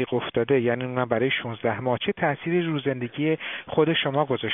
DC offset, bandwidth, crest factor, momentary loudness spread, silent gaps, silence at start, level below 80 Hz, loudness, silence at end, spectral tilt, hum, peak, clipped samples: under 0.1%; 3.9 kHz; 18 dB; 5 LU; none; 0 s; -62 dBFS; -25 LUFS; 0 s; -4 dB/octave; none; -6 dBFS; under 0.1%